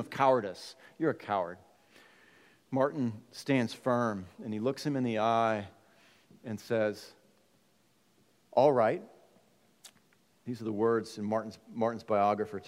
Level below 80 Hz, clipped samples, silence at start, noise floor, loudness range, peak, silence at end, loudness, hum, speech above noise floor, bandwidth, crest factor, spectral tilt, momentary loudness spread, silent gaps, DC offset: -80 dBFS; under 0.1%; 0 s; -69 dBFS; 3 LU; -12 dBFS; 0.05 s; -31 LUFS; none; 39 dB; 16 kHz; 22 dB; -6.5 dB/octave; 16 LU; none; under 0.1%